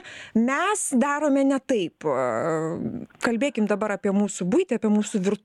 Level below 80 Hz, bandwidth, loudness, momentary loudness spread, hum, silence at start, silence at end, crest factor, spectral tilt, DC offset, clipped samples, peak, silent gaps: -66 dBFS; 12.5 kHz; -24 LUFS; 5 LU; none; 0.05 s; 0.1 s; 14 dB; -5 dB/octave; under 0.1%; under 0.1%; -10 dBFS; none